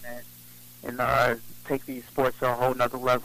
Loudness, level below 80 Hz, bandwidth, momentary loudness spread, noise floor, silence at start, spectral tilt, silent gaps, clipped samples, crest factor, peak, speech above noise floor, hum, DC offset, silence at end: -27 LUFS; -52 dBFS; 15.5 kHz; 20 LU; -49 dBFS; 0 s; -5 dB/octave; none; under 0.1%; 16 dB; -12 dBFS; 22 dB; 60 Hz at -55 dBFS; under 0.1%; 0 s